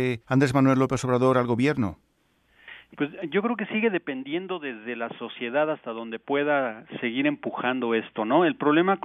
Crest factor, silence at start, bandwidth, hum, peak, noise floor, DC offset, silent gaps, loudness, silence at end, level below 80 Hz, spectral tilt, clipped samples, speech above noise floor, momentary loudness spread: 18 dB; 0 s; 12 kHz; none; -8 dBFS; -66 dBFS; under 0.1%; none; -25 LUFS; 0.05 s; -62 dBFS; -6.5 dB/octave; under 0.1%; 42 dB; 11 LU